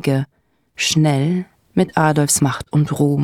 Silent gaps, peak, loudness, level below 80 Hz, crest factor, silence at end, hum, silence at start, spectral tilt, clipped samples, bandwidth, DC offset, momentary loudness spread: none; -2 dBFS; -17 LUFS; -52 dBFS; 14 dB; 0 s; none; 0.05 s; -5 dB/octave; under 0.1%; 16 kHz; under 0.1%; 8 LU